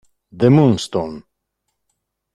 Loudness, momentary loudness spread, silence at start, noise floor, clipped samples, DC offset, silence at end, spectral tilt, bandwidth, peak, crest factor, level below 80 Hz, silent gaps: -16 LUFS; 12 LU; 0.35 s; -75 dBFS; under 0.1%; under 0.1%; 1.15 s; -7.5 dB/octave; 12 kHz; -2 dBFS; 18 dB; -52 dBFS; none